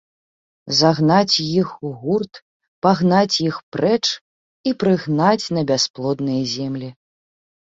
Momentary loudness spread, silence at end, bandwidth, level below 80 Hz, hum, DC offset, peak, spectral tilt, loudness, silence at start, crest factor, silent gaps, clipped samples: 11 LU; 0.8 s; 7.8 kHz; -58 dBFS; none; under 0.1%; -2 dBFS; -5 dB/octave; -19 LUFS; 0.65 s; 18 dB; 2.42-2.60 s, 2.68-2.82 s, 3.63-3.72 s, 4.21-4.64 s, 5.90-5.94 s; under 0.1%